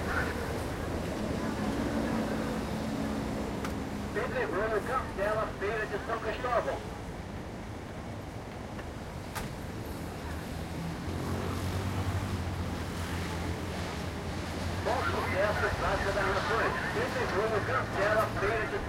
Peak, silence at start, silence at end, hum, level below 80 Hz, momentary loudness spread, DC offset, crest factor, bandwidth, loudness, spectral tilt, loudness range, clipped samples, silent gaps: -16 dBFS; 0 s; 0 s; none; -44 dBFS; 11 LU; under 0.1%; 18 dB; 16 kHz; -33 LUFS; -5.5 dB/octave; 9 LU; under 0.1%; none